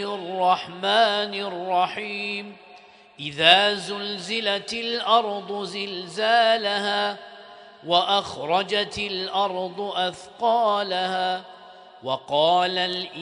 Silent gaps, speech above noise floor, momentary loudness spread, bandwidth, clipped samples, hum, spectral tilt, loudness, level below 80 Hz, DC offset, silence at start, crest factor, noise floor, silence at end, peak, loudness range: none; 26 dB; 11 LU; 10.5 kHz; under 0.1%; none; -3 dB/octave; -23 LUFS; -66 dBFS; under 0.1%; 0 s; 24 dB; -49 dBFS; 0 s; 0 dBFS; 3 LU